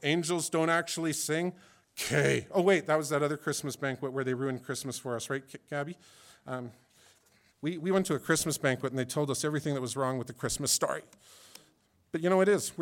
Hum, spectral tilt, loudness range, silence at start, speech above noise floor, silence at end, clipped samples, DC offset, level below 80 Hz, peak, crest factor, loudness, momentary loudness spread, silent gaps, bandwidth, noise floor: none; -4 dB/octave; 7 LU; 0 s; 37 dB; 0 s; under 0.1%; under 0.1%; -64 dBFS; -12 dBFS; 20 dB; -31 LUFS; 12 LU; none; 18 kHz; -68 dBFS